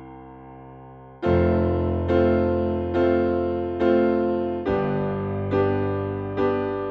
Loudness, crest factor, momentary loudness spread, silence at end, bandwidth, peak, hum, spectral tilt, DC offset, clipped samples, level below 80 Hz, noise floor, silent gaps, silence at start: -23 LUFS; 16 dB; 18 LU; 0 s; 5.6 kHz; -8 dBFS; none; -10 dB/octave; under 0.1%; under 0.1%; -42 dBFS; -43 dBFS; none; 0 s